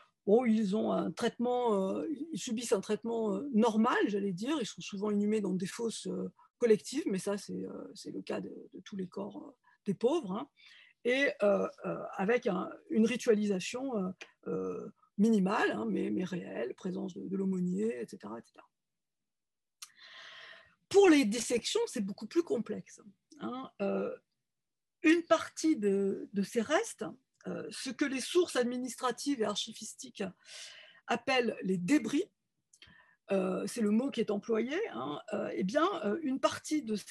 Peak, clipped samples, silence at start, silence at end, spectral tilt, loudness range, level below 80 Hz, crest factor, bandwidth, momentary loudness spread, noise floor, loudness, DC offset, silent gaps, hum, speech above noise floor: -12 dBFS; under 0.1%; 0.25 s; 0 s; -5 dB/octave; 7 LU; -80 dBFS; 20 dB; 12.5 kHz; 15 LU; under -90 dBFS; -33 LUFS; under 0.1%; none; none; over 58 dB